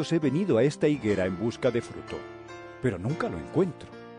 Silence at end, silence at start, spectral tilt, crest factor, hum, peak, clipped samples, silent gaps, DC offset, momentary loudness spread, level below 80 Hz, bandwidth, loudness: 0 s; 0 s; -7 dB/octave; 16 dB; none; -12 dBFS; under 0.1%; none; under 0.1%; 16 LU; -60 dBFS; 10 kHz; -27 LUFS